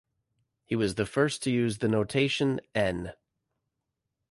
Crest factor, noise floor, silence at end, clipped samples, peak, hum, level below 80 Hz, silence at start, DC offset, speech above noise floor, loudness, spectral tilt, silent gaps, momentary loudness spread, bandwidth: 18 dB; -84 dBFS; 1.15 s; under 0.1%; -12 dBFS; none; -56 dBFS; 0.7 s; under 0.1%; 56 dB; -28 LUFS; -5.5 dB/octave; none; 6 LU; 11.5 kHz